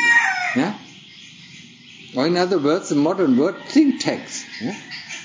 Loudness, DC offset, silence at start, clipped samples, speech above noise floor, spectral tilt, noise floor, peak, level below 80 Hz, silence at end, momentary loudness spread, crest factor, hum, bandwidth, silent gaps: -20 LUFS; under 0.1%; 0 s; under 0.1%; 24 dB; -4.5 dB/octave; -43 dBFS; -4 dBFS; -70 dBFS; 0 s; 23 LU; 16 dB; none; 7.8 kHz; none